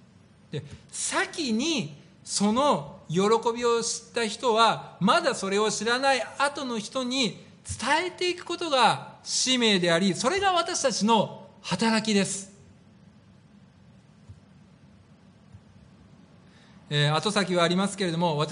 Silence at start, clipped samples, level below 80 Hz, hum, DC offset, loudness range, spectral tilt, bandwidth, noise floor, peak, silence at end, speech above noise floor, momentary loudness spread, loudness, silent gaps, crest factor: 0.55 s; under 0.1%; -62 dBFS; none; under 0.1%; 7 LU; -3.5 dB/octave; 10.5 kHz; -55 dBFS; -8 dBFS; 0 s; 30 dB; 10 LU; -25 LUFS; none; 20 dB